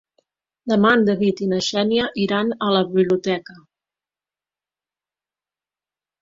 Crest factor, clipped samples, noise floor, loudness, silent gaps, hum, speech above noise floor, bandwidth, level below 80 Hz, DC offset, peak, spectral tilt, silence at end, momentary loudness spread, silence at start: 20 dB; under 0.1%; under -90 dBFS; -19 LUFS; none; 50 Hz at -45 dBFS; over 71 dB; 7.6 kHz; -60 dBFS; under 0.1%; -2 dBFS; -5.5 dB/octave; 2.65 s; 6 LU; 0.65 s